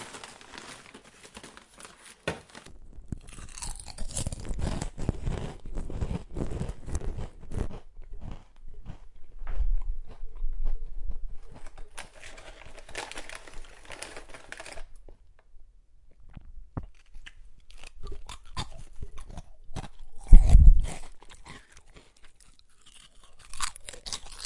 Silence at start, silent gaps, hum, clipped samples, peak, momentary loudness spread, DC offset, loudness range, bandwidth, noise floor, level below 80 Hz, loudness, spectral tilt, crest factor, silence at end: 0 s; none; none; under 0.1%; 0 dBFS; 16 LU; under 0.1%; 19 LU; 11.5 kHz; -54 dBFS; -28 dBFS; -32 LUFS; -5 dB/octave; 26 dB; 0 s